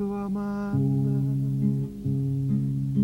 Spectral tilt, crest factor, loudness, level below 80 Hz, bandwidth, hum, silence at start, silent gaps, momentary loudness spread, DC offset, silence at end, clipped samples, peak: -10.5 dB/octave; 12 dB; -27 LUFS; -50 dBFS; 2.8 kHz; 50 Hz at -45 dBFS; 0 s; none; 5 LU; under 0.1%; 0 s; under 0.1%; -12 dBFS